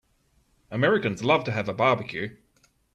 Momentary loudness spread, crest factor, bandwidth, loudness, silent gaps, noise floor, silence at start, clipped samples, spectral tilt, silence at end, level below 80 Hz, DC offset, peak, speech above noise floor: 12 LU; 20 dB; 10.5 kHz; -25 LUFS; none; -66 dBFS; 0.7 s; under 0.1%; -6 dB/octave; 0.6 s; -62 dBFS; under 0.1%; -8 dBFS; 42 dB